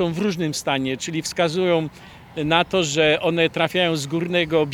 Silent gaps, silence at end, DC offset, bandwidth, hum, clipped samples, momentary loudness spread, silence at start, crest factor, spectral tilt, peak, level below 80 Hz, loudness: none; 0 s; under 0.1%; 17 kHz; none; under 0.1%; 7 LU; 0 s; 20 dB; -4.5 dB/octave; -2 dBFS; -52 dBFS; -21 LUFS